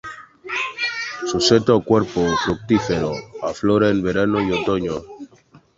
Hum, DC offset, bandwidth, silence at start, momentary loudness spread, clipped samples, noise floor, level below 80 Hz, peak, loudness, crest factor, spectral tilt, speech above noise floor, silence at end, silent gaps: none; under 0.1%; 8 kHz; 0.05 s; 12 LU; under 0.1%; -51 dBFS; -46 dBFS; -2 dBFS; -20 LUFS; 18 dB; -5 dB/octave; 33 dB; 0.5 s; none